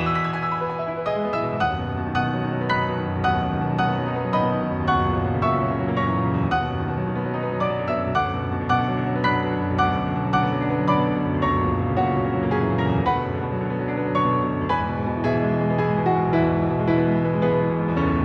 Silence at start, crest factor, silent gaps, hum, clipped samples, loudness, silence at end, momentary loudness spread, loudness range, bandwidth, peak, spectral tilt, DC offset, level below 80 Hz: 0 s; 14 dB; none; none; under 0.1%; -23 LUFS; 0 s; 5 LU; 2 LU; 6.8 kHz; -8 dBFS; -8.5 dB/octave; under 0.1%; -42 dBFS